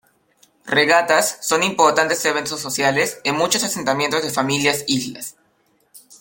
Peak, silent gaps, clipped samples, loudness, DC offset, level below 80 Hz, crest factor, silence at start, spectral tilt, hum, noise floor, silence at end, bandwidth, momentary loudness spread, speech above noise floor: 0 dBFS; none; under 0.1%; -18 LUFS; under 0.1%; -62 dBFS; 20 dB; 0.65 s; -2.5 dB/octave; none; -62 dBFS; 0.05 s; 17 kHz; 8 LU; 43 dB